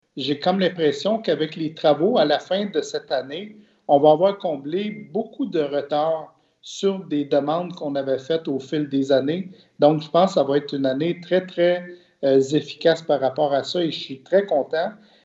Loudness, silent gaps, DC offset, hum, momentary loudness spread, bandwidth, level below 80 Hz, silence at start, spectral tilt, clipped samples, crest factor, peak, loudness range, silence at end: -22 LUFS; none; under 0.1%; none; 9 LU; 8 kHz; -74 dBFS; 0.15 s; -6 dB/octave; under 0.1%; 18 dB; -4 dBFS; 4 LU; 0.3 s